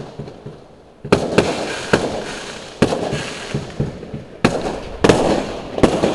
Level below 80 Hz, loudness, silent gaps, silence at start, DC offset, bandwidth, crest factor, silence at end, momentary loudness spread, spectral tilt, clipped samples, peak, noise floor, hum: -38 dBFS; -19 LUFS; none; 0 s; 0.1%; 12 kHz; 20 dB; 0 s; 17 LU; -5.5 dB/octave; under 0.1%; 0 dBFS; -43 dBFS; none